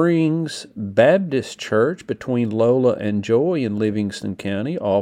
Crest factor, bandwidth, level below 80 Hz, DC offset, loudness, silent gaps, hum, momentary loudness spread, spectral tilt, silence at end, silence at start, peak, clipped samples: 18 dB; 13 kHz; -62 dBFS; under 0.1%; -20 LUFS; none; none; 10 LU; -7 dB/octave; 0 s; 0 s; 0 dBFS; under 0.1%